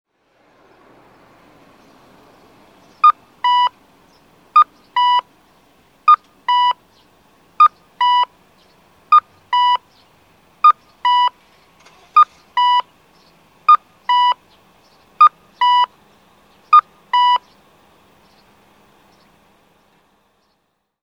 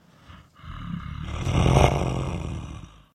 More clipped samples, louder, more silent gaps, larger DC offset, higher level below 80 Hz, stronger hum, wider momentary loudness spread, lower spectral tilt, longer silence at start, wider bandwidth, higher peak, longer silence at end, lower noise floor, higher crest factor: neither; first, -15 LUFS vs -25 LUFS; neither; neither; second, -68 dBFS vs -32 dBFS; neither; second, 7 LU vs 22 LU; second, -0.5 dB/octave vs -6 dB/octave; first, 3.05 s vs 0.3 s; second, 9.4 kHz vs 12.5 kHz; about the same, 0 dBFS vs 0 dBFS; first, 3.65 s vs 0.25 s; first, -68 dBFS vs -49 dBFS; second, 18 dB vs 24 dB